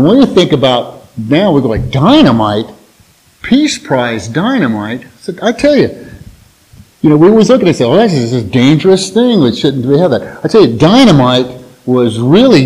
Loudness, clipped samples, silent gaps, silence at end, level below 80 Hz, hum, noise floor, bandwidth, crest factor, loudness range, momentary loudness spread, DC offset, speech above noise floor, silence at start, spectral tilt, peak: -9 LUFS; 1%; none; 0 s; -38 dBFS; none; -46 dBFS; 13.5 kHz; 10 dB; 5 LU; 12 LU; under 0.1%; 38 dB; 0 s; -6 dB/octave; 0 dBFS